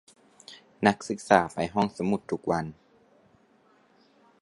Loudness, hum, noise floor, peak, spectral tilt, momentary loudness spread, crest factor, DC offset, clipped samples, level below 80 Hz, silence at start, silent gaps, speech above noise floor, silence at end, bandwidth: -27 LUFS; none; -62 dBFS; -2 dBFS; -5.5 dB/octave; 22 LU; 26 dB; under 0.1%; under 0.1%; -60 dBFS; 0.5 s; none; 36 dB; 1.7 s; 11.5 kHz